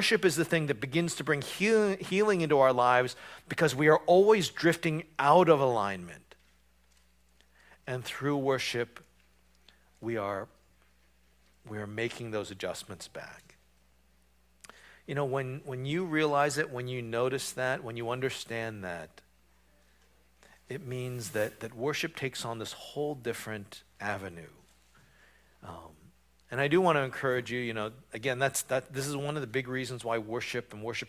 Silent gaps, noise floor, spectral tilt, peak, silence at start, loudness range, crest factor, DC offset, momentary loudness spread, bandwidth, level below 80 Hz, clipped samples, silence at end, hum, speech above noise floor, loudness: none; -67 dBFS; -5 dB/octave; -8 dBFS; 0 s; 14 LU; 24 dB; under 0.1%; 18 LU; 16 kHz; -66 dBFS; under 0.1%; 0 s; none; 37 dB; -30 LUFS